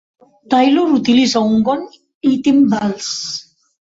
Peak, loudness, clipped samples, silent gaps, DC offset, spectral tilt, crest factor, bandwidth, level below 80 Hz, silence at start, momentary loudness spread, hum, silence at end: -2 dBFS; -15 LUFS; under 0.1%; 2.14-2.21 s; under 0.1%; -4.5 dB/octave; 14 dB; 7.8 kHz; -56 dBFS; 0.5 s; 10 LU; none; 0.4 s